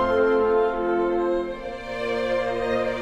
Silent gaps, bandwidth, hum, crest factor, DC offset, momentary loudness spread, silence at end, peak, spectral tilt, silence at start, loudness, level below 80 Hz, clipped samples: none; 9.2 kHz; none; 12 dB; under 0.1%; 10 LU; 0 s; -10 dBFS; -6 dB/octave; 0 s; -24 LUFS; -44 dBFS; under 0.1%